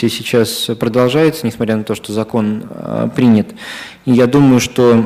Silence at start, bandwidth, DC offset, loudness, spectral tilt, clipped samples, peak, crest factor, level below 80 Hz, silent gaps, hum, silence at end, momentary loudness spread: 0 s; 16 kHz; under 0.1%; -14 LUFS; -6 dB/octave; under 0.1%; -2 dBFS; 10 dB; -48 dBFS; none; none; 0 s; 13 LU